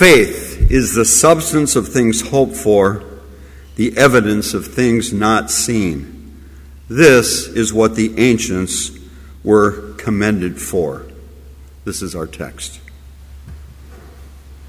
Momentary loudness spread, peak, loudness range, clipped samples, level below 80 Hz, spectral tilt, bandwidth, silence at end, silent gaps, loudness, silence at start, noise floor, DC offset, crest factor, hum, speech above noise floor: 17 LU; 0 dBFS; 12 LU; under 0.1%; -30 dBFS; -4 dB/octave; 16 kHz; 0 s; none; -14 LUFS; 0 s; -37 dBFS; under 0.1%; 16 dB; none; 24 dB